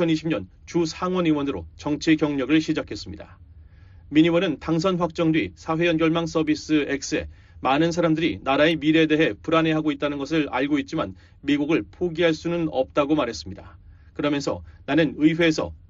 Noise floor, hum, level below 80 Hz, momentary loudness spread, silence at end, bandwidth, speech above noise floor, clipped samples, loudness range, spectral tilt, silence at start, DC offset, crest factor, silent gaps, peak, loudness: -47 dBFS; none; -48 dBFS; 10 LU; 0.1 s; 7.6 kHz; 25 dB; under 0.1%; 3 LU; -4.5 dB/octave; 0 s; under 0.1%; 16 dB; none; -6 dBFS; -23 LUFS